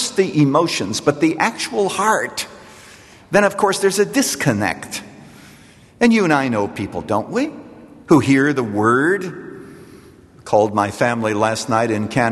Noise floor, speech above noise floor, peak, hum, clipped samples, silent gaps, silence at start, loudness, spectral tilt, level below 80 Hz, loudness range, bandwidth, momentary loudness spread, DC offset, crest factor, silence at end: -45 dBFS; 29 dB; -2 dBFS; none; under 0.1%; none; 0 s; -17 LUFS; -4.5 dB/octave; -54 dBFS; 2 LU; 13 kHz; 12 LU; under 0.1%; 18 dB; 0 s